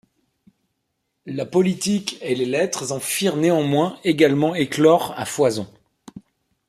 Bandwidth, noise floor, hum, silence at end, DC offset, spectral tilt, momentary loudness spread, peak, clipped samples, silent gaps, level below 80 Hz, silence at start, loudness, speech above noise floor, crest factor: 15.5 kHz; -75 dBFS; none; 0.5 s; under 0.1%; -5 dB/octave; 9 LU; -2 dBFS; under 0.1%; none; -64 dBFS; 1.25 s; -20 LUFS; 55 dB; 18 dB